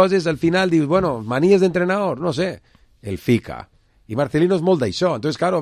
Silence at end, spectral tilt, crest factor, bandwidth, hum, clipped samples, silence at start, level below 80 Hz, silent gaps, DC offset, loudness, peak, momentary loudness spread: 0 s; -6.5 dB/octave; 18 dB; 14 kHz; none; under 0.1%; 0 s; -48 dBFS; none; under 0.1%; -19 LUFS; 0 dBFS; 13 LU